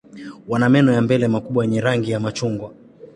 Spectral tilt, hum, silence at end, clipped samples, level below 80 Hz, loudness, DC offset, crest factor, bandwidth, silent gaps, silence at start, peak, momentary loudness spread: -7 dB/octave; none; 0.1 s; under 0.1%; -54 dBFS; -19 LUFS; under 0.1%; 16 dB; 11 kHz; none; 0.15 s; -2 dBFS; 18 LU